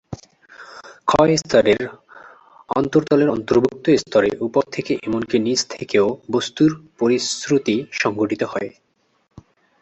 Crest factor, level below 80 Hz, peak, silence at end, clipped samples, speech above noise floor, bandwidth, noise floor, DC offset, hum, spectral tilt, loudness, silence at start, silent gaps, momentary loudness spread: 18 dB; -52 dBFS; -2 dBFS; 1.15 s; under 0.1%; 29 dB; 8.4 kHz; -48 dBFS; under 0.1%; none; -5 dB/octave; -19 LUFS; 0.1 s; none; 10 LU